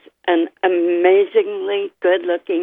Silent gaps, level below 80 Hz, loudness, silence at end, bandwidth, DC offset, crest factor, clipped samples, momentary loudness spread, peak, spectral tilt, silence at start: none; -78 dBFS; -17 LUFS; 0 s; 3.8 kHz; under 0.1%; 16 dB; under 0.1%; 7 LU; -2 dBFS; -7 dB/octave; 0.25 s